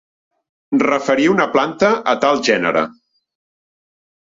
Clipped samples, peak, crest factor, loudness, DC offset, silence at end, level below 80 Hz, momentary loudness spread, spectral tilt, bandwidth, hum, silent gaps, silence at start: under 0.1%; -2 dBFS; 16 dB; -16 LUFS; under 0.1%; 1.3 s; -58 dBFS; 5 LU; -4.5 dB/octave; 7.8 kHz; none; none; 0.7 s